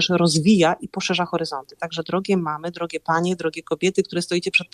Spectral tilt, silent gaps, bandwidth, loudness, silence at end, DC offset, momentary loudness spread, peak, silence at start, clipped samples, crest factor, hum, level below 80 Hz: -4.5 dB/octave; none; 13.5 kHz; -22 LUFS; 0.1 s; under 0.1%; 11 LU; -4 dBFS; 0 s; under 0.1%; 18 dB; none; -60 dBFS